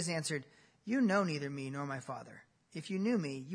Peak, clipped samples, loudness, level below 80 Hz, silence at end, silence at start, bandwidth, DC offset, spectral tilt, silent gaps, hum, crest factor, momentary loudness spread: -18 dBFS; under 0.1%; -36 LUFS; -82 dBFS; 0 s; 0 s; 11 kHz; under 0.1%; -5 dB/octave; none; none; 20 dB; 17 LU